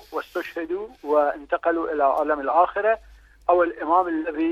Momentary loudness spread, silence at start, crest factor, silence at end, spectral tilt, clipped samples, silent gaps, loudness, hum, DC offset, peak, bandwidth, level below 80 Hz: 9 LU; 0.1 s; 18 dB; 0 s; -6 dB/octave; under 0.1%; none; -23 LUFS; 50 Hz at -60 dBFS; under 0.1%; -6 dBFS; 14.5 kHz; -54 dBFS